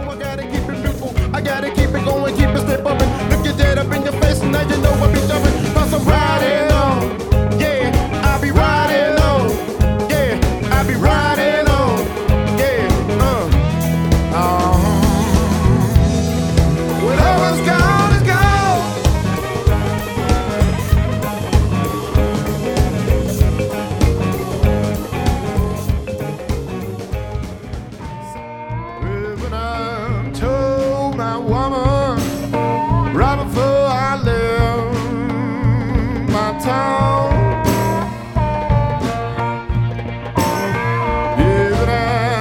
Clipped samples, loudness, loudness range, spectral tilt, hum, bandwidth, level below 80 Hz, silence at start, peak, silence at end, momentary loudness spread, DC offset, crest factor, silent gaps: under 0.1%; -17 LUFS; 6 LU; -6 dB/octave; none; over 20 kHz; -22 dBFS; 0 s; 0 dBFS; 0 s; 8 LU; under 0.1%; 16 dB; none